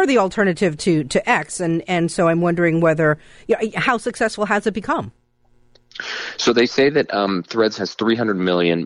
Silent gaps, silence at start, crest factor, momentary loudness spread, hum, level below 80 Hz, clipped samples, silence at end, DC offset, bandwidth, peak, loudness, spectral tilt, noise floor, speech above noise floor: none; 0 s; 14 dB; 7 LU; none; -52 dBFS; under 0.1%; 0 s; under 0.1%; 11 kHz; -4 dBFS; -19 LUFS; -5 dB/octave; -56 dBFS; 38 dB